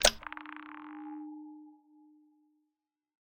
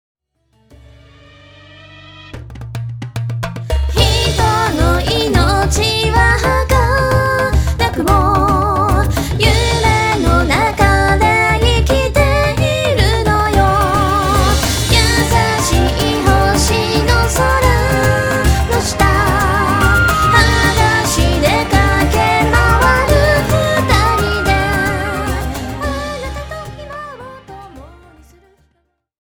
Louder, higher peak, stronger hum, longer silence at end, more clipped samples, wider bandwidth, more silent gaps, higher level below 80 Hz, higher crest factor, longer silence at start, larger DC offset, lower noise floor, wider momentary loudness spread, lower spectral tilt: second, -38 LUFS vs -13 LUFS; second, -4 dBFS vs 0 dBFS; neither; first, 1.6 s vs 1.45 s; neither; second, 16.5 kHz vs over 20 kHz; neither; second, -54 dBFS vs -20 dBFS; first, 34 dB vs 14 dB; second, 0 s vs 1.9 s; neither; first, -87 dBFS vs -64 dBFS; about the same, 12 LU vs 11 LU; second, -0.5 dB/octave vs -4.5 dB/octave